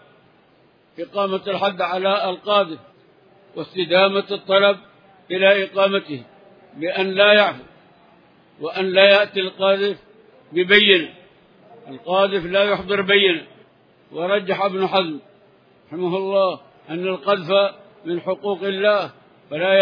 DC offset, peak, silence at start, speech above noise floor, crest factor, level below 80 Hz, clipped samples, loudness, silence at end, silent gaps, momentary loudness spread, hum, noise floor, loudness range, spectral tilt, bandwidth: under 0.1%; 0 dBFS; 1 s; 37 dB; 20 dB; -64 dBFS; under 0.1%; -18 LUFS; 0 s; none; 19 LU; none; -56 dBFS; 6 LU; -6.5 dB/octave; 5.2 kHz